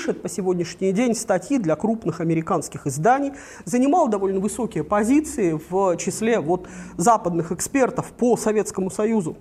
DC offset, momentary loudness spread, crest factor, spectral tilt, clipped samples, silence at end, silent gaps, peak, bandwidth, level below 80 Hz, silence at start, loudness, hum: under 0.1%; 7 LU; 18 dB; -5.5 dB/octave; under 0.1%; 0 s; none; -4 dBFS; 15.5 kHz; -52 dBFS; 0 s; -22 LUFS; none